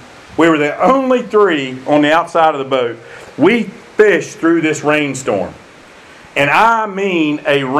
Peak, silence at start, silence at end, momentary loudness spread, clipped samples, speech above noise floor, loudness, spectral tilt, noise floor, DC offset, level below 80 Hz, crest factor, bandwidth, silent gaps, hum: 0 dBFS; 0 s; 0 s; 9 LU; under 0.1%; 26 dB; -13 LUFS; -5 dB/octave; -39 dBFS; under 0.1%; -54 dBFS; 14 dB; 13 kHz; none; none